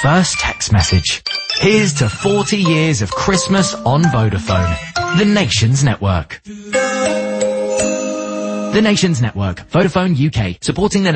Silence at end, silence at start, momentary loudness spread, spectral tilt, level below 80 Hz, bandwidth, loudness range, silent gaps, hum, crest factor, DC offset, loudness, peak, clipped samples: 0 s; 0 s; 7 LU; -5 dB/octave; -34 dBFS; 8.8 kHz; 3 LU; none; none; 14 dB; under 0.1%; -15 LUFS; -2 dBFS; under 0.1%